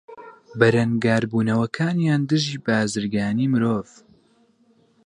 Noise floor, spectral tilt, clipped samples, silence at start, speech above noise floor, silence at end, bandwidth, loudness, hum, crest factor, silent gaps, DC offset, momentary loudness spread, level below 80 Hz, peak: -60 dBFS; -6 dB/octave; under 0.1%; 0.1 s; 39 dB; 1.25 s; 11 kHz; -21 LUFS; none; 20 dB; none; under 0.1%; 5 LU; -58 dBFS; -2 dBFS